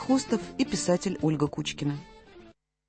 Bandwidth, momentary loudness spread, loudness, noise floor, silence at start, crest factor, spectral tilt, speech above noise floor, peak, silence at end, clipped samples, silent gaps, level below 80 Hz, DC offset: 8.8 kHz; 7 LU; -29 LUFS; -55 dBFS; 0 s; 18 dB; -5 dB/octave; 28 dB; -10 dBFS; 0.4 s; under 0.1%; none; -56 dBFS; under 0.1%